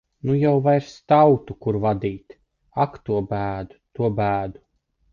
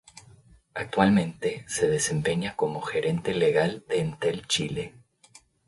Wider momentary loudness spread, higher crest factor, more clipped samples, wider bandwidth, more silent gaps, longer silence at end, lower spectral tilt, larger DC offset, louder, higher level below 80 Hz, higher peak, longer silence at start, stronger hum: first, 15 LU vs 10 LU; about the same, 18 dB vs 22 dB; neither; second, 7.2 kHz vs 11.5 kHz; neither; second, 0.6 s vs 0.8 s; first, -9 dB/octave vs -4.5 dB/octave; neither; first, -21 LUFS vs -26 LUFS; first, -50 dBFS vs -56 dBFS; about the same, -4 dBFS vs -6 dBFS; about the same, 0.25 s vs 0.15 s; neither